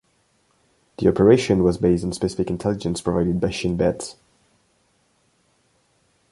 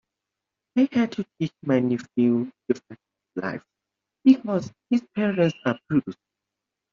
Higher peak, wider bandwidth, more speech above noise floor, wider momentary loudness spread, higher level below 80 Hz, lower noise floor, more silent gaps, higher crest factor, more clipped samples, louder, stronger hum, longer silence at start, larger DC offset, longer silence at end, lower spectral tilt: first, -2 dBFS vs -6 dBFS; first, 11.5 kHz vs 7.2 kHz; second, 45 dB vs 62 dB; about the same, 9 LU vs 11 LU; first, -44 dBFS vs -66 dBFS; second, -64 dBFS vs -86 dBFS; neither; about the same, 20 dB vs 20 dB; neither; first, -21 LUFS vs -24 LUFS; neither; first, 1 s vs 0.75 s; neither; first, 2.2 s vs 0.8 s; about the same, -6.5 dB/octave vs -6.5 dB/octave